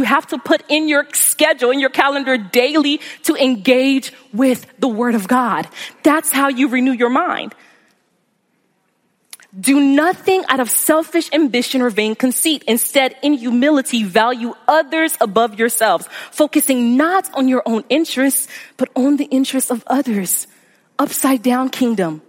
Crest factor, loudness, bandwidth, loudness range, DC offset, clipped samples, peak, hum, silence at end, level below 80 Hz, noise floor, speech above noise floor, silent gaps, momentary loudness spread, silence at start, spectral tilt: 16 dB; -15 LUFS; 16.5 kHz; 3 LU; under 0.1%; under 0.1%; 0 dBFS; none; 0.1 s; -72 dBFS; -64 dBFS; 48 dB; none; 6 LU; 0 s; -2.5 dB/octave